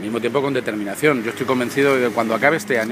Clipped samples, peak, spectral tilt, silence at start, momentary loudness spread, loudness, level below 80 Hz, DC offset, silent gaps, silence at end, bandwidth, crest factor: under 0.1%; 0 dBFS; -5 dB/octave; 0 s; 5 LU; -19 LUFS; -64 dBFS; under 0.1%; none; 0 s; 15.5 kHz; 18 dB